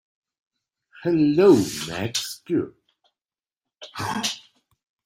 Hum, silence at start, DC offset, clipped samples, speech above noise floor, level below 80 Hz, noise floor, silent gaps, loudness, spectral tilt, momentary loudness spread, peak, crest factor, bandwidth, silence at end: none; 1 s; under 0.1%; under 0.1%; over 70 dB; -60 dBFS; under -90 dBFS; none; -22 LUFS; -5 dB/octave; 17 LU; -4 dBFS; 20 dB; 16 kHz; 0.7 s